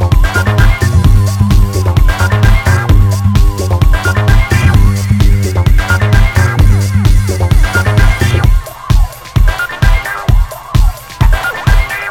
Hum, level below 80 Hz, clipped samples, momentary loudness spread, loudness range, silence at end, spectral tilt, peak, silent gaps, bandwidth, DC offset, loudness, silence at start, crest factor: none; -12 dBFS; 1%; 4 LU; 3 LU; 0 s; -6 dB/octave; 0 dBFS; none; 16.5 kHz; under 0.1%; -11 LUFS; 0 s; 8 dB